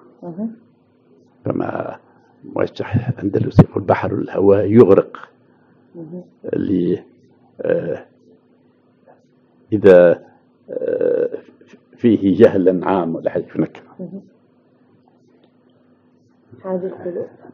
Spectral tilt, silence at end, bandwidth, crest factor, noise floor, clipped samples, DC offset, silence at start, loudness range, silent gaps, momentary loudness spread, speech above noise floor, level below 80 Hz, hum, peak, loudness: -8 dB/octave; 0.3 s; 6.4 kHz; 18 dB; -55 dBFS; 0.2%; under 0.1%; 0.2 s; 11 LU; none; 22 LU; 39 dB; -50 dBFS; none; 0 dBFS; -17 LUFS